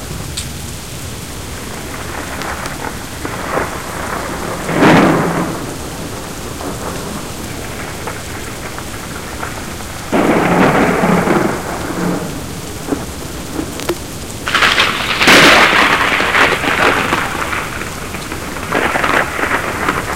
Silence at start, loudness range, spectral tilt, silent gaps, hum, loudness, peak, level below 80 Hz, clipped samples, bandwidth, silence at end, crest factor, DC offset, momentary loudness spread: 0 s; 14 LU; -3.5 dB/octave; none; none; -15 LUFS; 0 dBFS; -34 dBFS; 0.1%; 18 kHz; 0 s; 16 dB; 2%; 15 LU